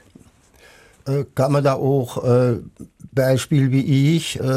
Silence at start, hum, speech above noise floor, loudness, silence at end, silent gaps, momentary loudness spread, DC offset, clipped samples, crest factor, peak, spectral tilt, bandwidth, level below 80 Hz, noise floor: 1.05 s; none; 33 dB; -19 LUFS; 0 s; none; 8 LU; under 0.1%; under 0.1%; 14 dB; -6 dBFS; -7 dB/octave; 14.5 kHz; -52 dBFS; -51 dBFS